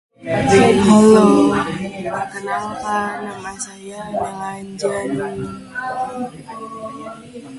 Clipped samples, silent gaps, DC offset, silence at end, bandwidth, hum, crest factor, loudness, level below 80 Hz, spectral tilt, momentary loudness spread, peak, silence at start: under 0.1%; none; under 0.1%; 0 s; 11.5 kHz; none; 18 dB; -17 LUFS; -48 dBFS; -5.5 dB/octave; 20 LU; 0 dBFS; 0.2 s